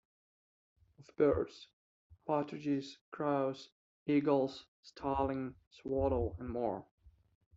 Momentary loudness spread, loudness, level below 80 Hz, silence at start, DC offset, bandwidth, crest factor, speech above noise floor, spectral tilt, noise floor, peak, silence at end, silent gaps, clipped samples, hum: 17 LU; -36 LUFS; -58 dBFS; 1 s; under 0.1%; 7.6 kHz; 18 dB; over 55 dB; -6.5 dB/octave; under -90 dBFS; -18 dBFS; 0.45 s; 1.73-2.10 s, 3.01-3.12 s, 3.72-4.06 s, 4.68-4.83 s, 5.67-5.71 s, 6.91-6.98 s; under 0.1%; none